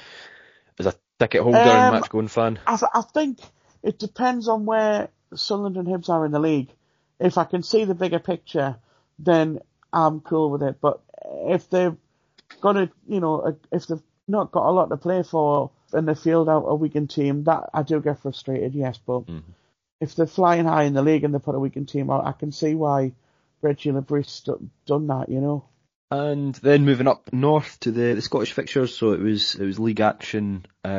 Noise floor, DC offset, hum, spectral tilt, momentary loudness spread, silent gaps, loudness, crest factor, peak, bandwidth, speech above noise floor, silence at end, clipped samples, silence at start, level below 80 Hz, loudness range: -52 dBFS; under 0.1%; none; -5.5 dB/octave; 10 LU; 19.92-19.99 s, 25.95-26.08 s; -22 LUFS; 20 dB; -2 dBFS; 7.4 kHz; 30 dB; 0 s; under 0.1%; 0.05 s; -64 dBFS; 5 LU